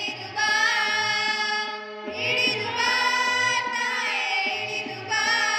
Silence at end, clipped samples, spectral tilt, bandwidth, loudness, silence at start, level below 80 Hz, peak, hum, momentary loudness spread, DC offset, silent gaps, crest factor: 0 s; under 0.1%; -1 dB/octave; 16.5 kHz; -23 LUFS; 0 s; -72 dBFS; -10 dBFS; none; 8 LU; under 0.1%; none; 14 dB